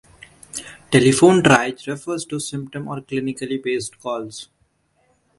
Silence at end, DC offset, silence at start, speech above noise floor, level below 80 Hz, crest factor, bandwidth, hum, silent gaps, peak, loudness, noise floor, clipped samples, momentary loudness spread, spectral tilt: 0.95 s; under 0.1%; 0.55 s; 45 dB; -56 dBFS; 20 dB; 11.5 kHz; none; none; 0 dBFS; -19 LUFS; -64 dBFS; under 0.1%; 20 LU; -5 dB/octave